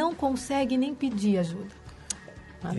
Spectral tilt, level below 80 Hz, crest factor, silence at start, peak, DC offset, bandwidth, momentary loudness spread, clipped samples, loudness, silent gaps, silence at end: -5.5 dB/octave; -54 dBFS; 18 dB; 0 s; -12 dBFS; under 0.1%; 11.5 kHz; 16 LU; under 0.1%; -29 LUFS; none; 0 s